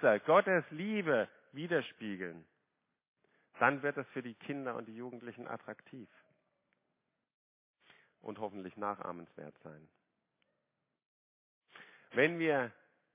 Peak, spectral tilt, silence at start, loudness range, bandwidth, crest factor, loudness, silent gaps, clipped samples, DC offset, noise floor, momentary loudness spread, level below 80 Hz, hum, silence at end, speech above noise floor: -12 dBFS; -4 dB/octave; 0 s; 14 LU; 3.9 kHz; 26 dB; -35 LUFS; 3.08-3.16 s, 7.34-7.74 s, 11.05-11.61 s; under 0.1%; under 0.1%; -86 dBFS; 22 LU; -86 dBFS; none; 0.45 s; 50 dB